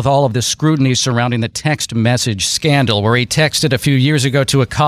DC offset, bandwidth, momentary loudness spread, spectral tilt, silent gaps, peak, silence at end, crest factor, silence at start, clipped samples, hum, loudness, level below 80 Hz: under 0.1%; 15.5 kHz; 4 LU; -4.5 dB/octave; none; -2 dBFS; 0 s; 12 dB; 0 s; under 0.1%; none; -14 LUFS; -42 dBFS